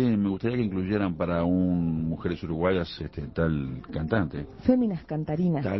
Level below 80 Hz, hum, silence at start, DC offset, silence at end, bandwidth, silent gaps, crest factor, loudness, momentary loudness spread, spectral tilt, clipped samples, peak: -44 dBFS; none; 0 s; under 0.1%; 0 s; 6 kHz; none; 18 dB; -27 LUFS; 8 LU; -10 dB/octave; under 0.1%; -8 dBFS